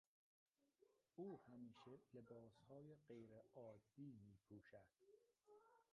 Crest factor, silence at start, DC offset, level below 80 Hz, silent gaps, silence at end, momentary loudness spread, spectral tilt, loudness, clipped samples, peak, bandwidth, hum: 20 dB; 0.6 s; under 0.1%; under -90 dBFS; none; 0.1 s; 9 LU; -7.5 dB/octave; -64 LUFS; under 0.1%; -46 dBFS; 5.8 kHz; none